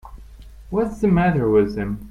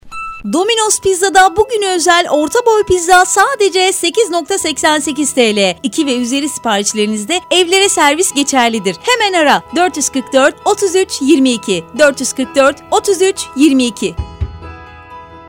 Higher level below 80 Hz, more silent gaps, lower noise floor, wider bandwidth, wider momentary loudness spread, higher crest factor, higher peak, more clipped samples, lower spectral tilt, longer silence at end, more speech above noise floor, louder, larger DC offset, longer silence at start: about the same, -38 dBFS vs -38 dBFS; neither; first, -41 dBFS vs -33 dBFS; second, 10.5 kHz vs 18 kHz; about the same, 9 LU vs 7 LU; about the same, 14 dB vs 12 dB; second, -6 dBFS vs 0 dBFS; second, under 0.1% vs 0.2%; first, -9 dB/octave vs -2.5 dB/octave; about the same, 0 s vs 0 s; about the same, 22 dB vs 21 dB; second, -20 LUFS vs -12 LUFS; neither; about the same, 0.05 s vs 0.05 s